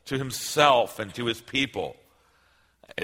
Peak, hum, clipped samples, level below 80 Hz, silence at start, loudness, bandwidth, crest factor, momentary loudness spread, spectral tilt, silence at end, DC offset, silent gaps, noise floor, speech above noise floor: -4 dBFS; none; under 0.1%; -60 dBFS; 0.05 s; -25 LUFS; 16.5 kHz; 24 dB; 15 LU; -3.5 dB/octave; 0 s; under 0.1%; none; -64 dBFS; 38 dB